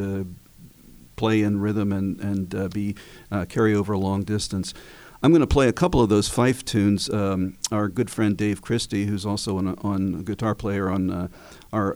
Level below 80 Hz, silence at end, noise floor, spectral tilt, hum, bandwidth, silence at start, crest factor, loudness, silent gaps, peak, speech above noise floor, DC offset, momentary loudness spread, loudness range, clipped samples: -42 dBFS; 0 s; -49 dBFS; -6 dB/octave; none; over 20 kHz; 0 s; 18 dB; -24 LUFS; none; -6 dBFS; 26 dB; under 0.1%; 10 LU; 5 LU; under 0.1%